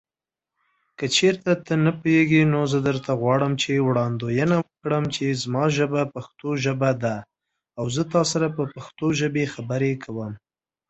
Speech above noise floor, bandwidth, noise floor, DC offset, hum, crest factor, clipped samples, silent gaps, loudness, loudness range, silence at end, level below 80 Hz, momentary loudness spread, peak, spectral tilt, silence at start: 68 dB; 8.2 kHz; -90 dBFS; under 0.1%; none; 18 dB; under 0.1%; none; -23 LUFS; 4 LU; 0.5 s; -58 dBFS; 11 LU; -6 dBFS; -5.5 dB/octave; 1 s